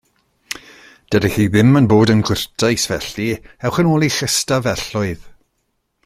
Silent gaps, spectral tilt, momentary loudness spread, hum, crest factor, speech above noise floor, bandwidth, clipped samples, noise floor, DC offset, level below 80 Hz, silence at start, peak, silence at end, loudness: none; -5 dB/octave; 14 LU; none; 16 dB; 53 dB; 16 kHz; under 0.1%; -69 dBFS; under 0.1%; -44 dBFS; 0.5 s; -2 dBFS; 0.75 s; -16 LUFS